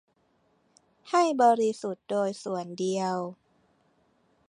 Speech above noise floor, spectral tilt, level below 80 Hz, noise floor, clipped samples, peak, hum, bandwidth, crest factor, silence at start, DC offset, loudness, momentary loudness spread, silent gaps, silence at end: 43 dB; -5 dB/octave; -82 dBFS; -69 dBFS; under 0.1%; -10 dBFS; none; 11 kHz; 20 dB; 1.05 s; under 0.1%; -27 LUFS; 12 LU; none; 1.15 s